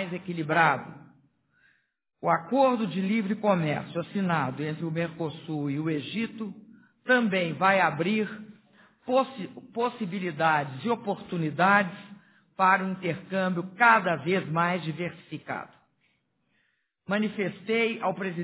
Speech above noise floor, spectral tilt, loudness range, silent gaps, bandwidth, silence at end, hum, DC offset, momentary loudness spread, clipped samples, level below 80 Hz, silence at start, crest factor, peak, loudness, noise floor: 46 dB; -4.5 dB/octave; 6 LU; none; 4 kHz; 0 s; none; under 0.1%; 13 LU; under 0.1%; -72 dBFS; 0 s; 22 dB; -6 dBFS; -27 LUFS; -73 dBFS